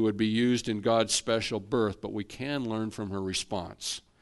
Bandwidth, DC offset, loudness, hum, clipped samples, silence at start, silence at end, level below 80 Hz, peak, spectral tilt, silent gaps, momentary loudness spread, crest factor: 11.5 kHz; under 0.1%; -30 LUFS; none; under 0.1%; 0 s; 0.2 s; -58 dBFS; -12 dBFS; -4 dB/octave; none; 10 LU; 18 dB